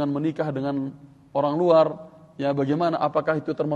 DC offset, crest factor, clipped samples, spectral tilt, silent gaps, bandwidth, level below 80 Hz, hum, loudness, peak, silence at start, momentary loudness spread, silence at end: under 0.1%; 18 dB; under 0.1%; -8.5 dB/octave; none; 7.6 kHz; -66 dBFS; none; -24 LUFS; -6 dBFS; 0 s; 12 LU; 0 s